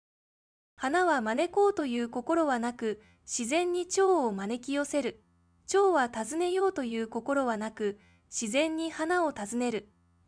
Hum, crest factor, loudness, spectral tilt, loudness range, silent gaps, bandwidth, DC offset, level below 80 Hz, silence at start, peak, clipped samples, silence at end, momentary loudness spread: none; 16 dB; -30 LUFS; -3.5 dB/octave; 2 LU; none; 10.5 kHz; under 0.1%; -68 dBFS; 0.8 s; -14 dBFS; under 0.1%; 0.45 s; 10 LU